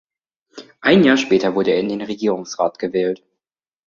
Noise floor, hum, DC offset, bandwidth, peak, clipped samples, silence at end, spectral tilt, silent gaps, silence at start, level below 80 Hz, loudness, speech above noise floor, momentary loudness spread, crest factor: -88 dBFS; none; under 0.1%; 7.6 kHz; -2 dBFS; under 0.1%; 0.7 s; -5.5 dB/octave; none; 0.55 s; -58 dBFS; -18 LUFS; 71 dB; 10 LU; 18 dB